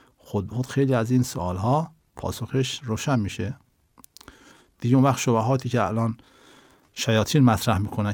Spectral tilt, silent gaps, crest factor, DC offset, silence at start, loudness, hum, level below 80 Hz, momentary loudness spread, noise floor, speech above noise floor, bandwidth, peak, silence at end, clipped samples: -6 dB/octave; none; 18 dB; under 0.1%; 0.25 s; -24 LUFS; none; -56 dBFS; 13 LU; -56 dBFS; 33 dB; 19 kHz; -6 dBFS; 0 s; under 0.1%